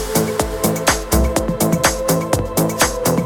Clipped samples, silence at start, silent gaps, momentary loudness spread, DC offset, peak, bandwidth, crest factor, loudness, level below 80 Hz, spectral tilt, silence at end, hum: under 0.1%; 0 s; none; 3 LU; under 0.1%; 0 dBFS; 19.5 kHz; 16 dB; -17 LUFS; -28 dBFS; -4 dB/octave; 0 s; none